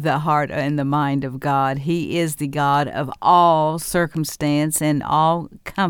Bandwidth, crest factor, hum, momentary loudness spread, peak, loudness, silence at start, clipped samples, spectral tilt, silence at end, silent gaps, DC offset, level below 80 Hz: 19 kHz; 16 dB; none; 7 LU; -4 dBFS; -19 LUFS; 0 s; under 0.1%; -5.5 dB/octave; 0 s; none; under 0.1%; -50 dBFS